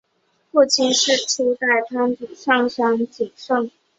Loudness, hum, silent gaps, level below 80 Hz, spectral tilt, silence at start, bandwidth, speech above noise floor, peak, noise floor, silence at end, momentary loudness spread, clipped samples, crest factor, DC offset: -19 LUFS; none; none; -68 dBFS; -1.5 dB/octave; 0.55 s; 8.2 kHz; 47 dB; -2 dBFS; -66 dBFS; 0.3 s; 7 LU; under 0.1%; 18 dB; under 0.1%